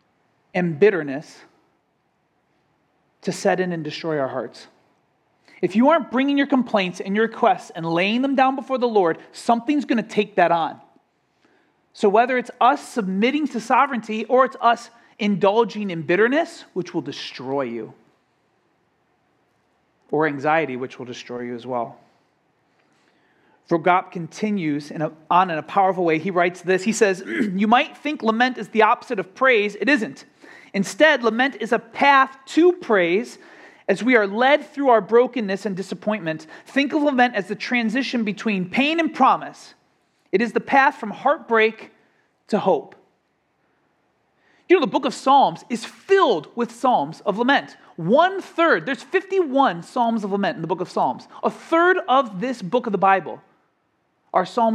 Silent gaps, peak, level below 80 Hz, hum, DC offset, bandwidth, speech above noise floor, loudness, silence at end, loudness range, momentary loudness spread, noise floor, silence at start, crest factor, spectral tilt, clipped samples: none; -2 dBFS; -76 dBFS; none; under 0.1%; 12.5 kHz; 48 dB; -20 LUFS; 0 s; 8 LU; 11 LU; -68 dBFS; 0.55 s; 20 dB; -5.5 dB/octave; under 0.1%